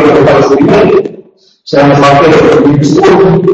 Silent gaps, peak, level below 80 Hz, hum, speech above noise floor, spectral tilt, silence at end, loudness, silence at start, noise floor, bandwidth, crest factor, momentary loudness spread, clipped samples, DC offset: none; 0 dBFS; -34 dBFS; none; 32 dB; -7 dB/octave; 0 s; -5 LUFS; 0 s; -36 dBFS; 8.4 kHz; 6 dB; 5 LU; 3%; under 0.1%